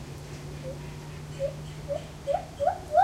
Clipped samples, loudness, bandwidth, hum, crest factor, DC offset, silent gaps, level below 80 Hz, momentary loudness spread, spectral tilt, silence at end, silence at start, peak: under 0.1%; -33 LUFS; 16 kHz; none; 20 dB; under 0.1%; none; -48 dBFS; 12 LU; -6 dB/octave; 0 s; 0 s; -10 dBFS